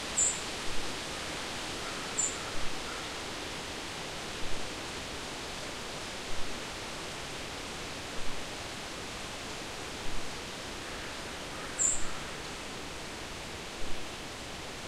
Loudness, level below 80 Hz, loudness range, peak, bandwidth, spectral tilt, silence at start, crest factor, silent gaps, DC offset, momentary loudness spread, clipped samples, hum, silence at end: -36 LUFS; -48 dBFS; 4 LU; -16 dBFS; 15.5 kHz; -1.5 dB/octave; 0 s; 20 dB; none; under 0.1%; 9 LU; under 0.1%; none; 0 s